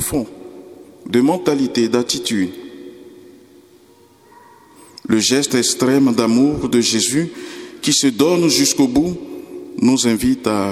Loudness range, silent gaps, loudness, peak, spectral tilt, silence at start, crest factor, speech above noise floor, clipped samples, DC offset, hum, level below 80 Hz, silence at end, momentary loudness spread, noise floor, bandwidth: 8 LU; none; -16 LUFS; 0 dBFS; -3.5 dB/octave; 0 s; 18 dB; 33 dB; under 0.1%; under 0.1%; none; -48 dBFS; 0 s; 18 LU; -49 dBFS; 15.5 kHz